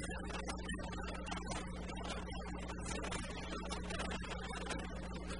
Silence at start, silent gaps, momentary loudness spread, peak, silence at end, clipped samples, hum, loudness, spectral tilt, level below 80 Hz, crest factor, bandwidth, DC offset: 0 s; none; 3 LU; -26 dBFS; 0 s; under 0.1%; none; -44 LUFS; -4.5 dB/octave; -48 dBFS; 16 dB; 10.5 kHz; 0.2%